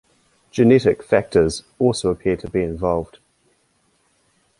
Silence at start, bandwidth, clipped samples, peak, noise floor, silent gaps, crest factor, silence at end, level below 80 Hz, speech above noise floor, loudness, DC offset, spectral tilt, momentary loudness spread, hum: 0.55 s; 11.5 kHz; under 0.1%; -2 dBFS; -64 dBFS; none; 18 dB; 1.55 s; -44 dBFS; 45 dB; -19 LUFS; under 0.1%; -6.5 dB/octave; 9 LU; none